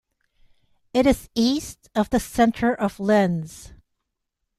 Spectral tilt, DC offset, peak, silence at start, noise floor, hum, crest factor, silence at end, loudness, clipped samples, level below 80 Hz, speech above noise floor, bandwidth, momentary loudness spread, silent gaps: -5.5 dB/octave; under 0.1%; -4 dBFS; 0.95 s; -79 dBFS; none; 20 dB; 0.85 s; -22 LUFS; under 0.1%; -46 dBFS; 58 dB; 14 kHz; 9 LU; none